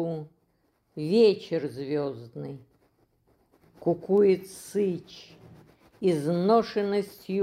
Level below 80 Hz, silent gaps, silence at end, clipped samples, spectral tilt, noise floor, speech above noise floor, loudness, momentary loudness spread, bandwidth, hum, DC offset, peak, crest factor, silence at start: -70 dBFS; none; 0 s; under 0.1%; -7 dB/octave; -70 dBFS; 44 dB; -26 LUFS; 19 LU; 14.5 kHz; none; under 0.1%; -10 dBFS; 18 dB; 0 s